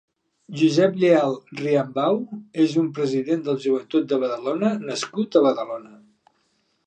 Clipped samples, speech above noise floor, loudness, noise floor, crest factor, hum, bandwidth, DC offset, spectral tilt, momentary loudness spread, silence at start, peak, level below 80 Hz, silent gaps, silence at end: under 0.1%; 47 dB; -22 LUFS; -68 dBFS; 18 dB; none; 9 kHz; under 0.1%; -6 dB/octave; 10 LU; 0.5 s; -4 dBFS; -76 dBFS; none; 1 s